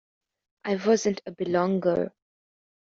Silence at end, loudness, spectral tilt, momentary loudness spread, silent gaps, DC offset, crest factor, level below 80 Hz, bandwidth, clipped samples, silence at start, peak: 0.9 s; -26 LUFS; -5.5 dB/octave; 10 LU; none; under 0.1%; 18 dB; -66 dBFS; 7.6 kHz; under 0.1%; 0.65 s; -10 dBFS